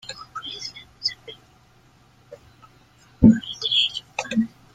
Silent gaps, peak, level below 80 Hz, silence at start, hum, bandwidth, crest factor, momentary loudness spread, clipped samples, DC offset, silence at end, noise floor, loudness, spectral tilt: none; 0 dBFS; -46 dBFS; 0.1 s; none; 9 kHz; 24 dB; 19 LU; under 0.1%; under 0.1%; 0.3 s; -55 dBFS; -22 LUFS; -5 dB/octave